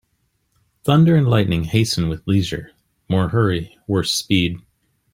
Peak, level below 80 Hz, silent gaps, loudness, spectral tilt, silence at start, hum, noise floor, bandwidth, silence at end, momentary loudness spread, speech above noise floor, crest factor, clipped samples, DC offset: -2 dBFS; -44 dBFS; none; -19 LUFS; -6 dB/octave; 0.85 s; none; -67 dBFS; 16 kHz; 0.55 s; 12 LU; 50 dB; 18 dB; under 0.1%; under 0.1%